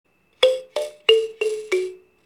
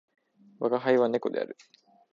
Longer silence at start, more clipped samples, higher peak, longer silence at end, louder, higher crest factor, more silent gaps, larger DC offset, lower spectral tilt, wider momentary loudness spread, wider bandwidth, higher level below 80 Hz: second, 0.4 s vs 0.6 s; neither; first, -2 dBFS vs -10 dBFS; second, 0.3 s vs 0.6 s; first, -21 LUFS vs -28 LUFS; about the same, 22 dB vs 20 dB; neither; neither; second, -1 dB/octave vs -7 dB/octave; second, 10 LU vs 14 LU; first, 14 kHz vs 7.2 kHz; first, -74 dBFS vs -82 dBFS